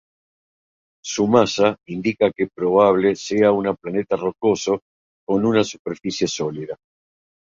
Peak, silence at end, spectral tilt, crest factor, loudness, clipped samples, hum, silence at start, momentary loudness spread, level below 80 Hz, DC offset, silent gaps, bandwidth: -2 dBFS; 0.65 s; -5 dB/octave; 18 dB; -20 LUFS; under 0.1%; none; 1.05 s; 12 LU; -58 dBFS; under 0.1%; 4.82-5.27 s, 5.79-5.85 s; 7.6 kHz